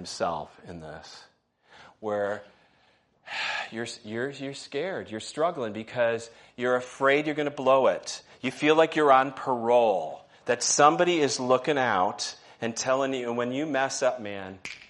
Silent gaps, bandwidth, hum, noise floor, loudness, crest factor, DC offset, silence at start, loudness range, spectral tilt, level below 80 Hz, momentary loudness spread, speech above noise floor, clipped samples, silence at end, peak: none; 11.5 kHz; none; -65 dBFS; -26 LUFS; 22 dB; under 0.1%; 0 s; 11 LU; -3.5 dB/octave; -72 dBFS; 16 LU; 38 dB; under 0.1%; 0.1 s; -6 dBFS